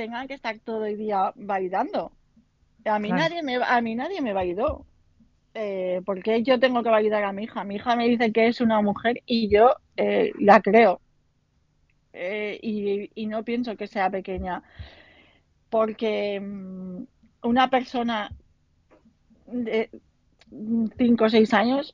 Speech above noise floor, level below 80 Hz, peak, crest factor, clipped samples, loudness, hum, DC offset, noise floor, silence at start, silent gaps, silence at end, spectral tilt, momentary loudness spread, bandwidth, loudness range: 43 dB; -54 dBFS; -4 dBFS; 20 dB; under 0.1%; -24 LUFS; none; under 0.1%; -67 dBFS; 0 s; none; 0.05 s; -6.5 dB/octave; 15 LU; 7.4 kHz; 9 LU